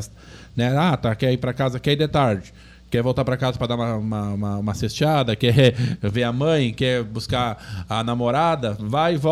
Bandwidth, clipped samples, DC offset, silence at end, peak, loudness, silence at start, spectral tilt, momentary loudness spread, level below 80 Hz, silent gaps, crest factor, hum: 14 kHz; under 0.1%; under 0.1%; 0 s; -4 dBFS; -21 LUFS; 0 s; -6.5 dB/octave; 7 LU; -44 dBFS; none; 16 dB; none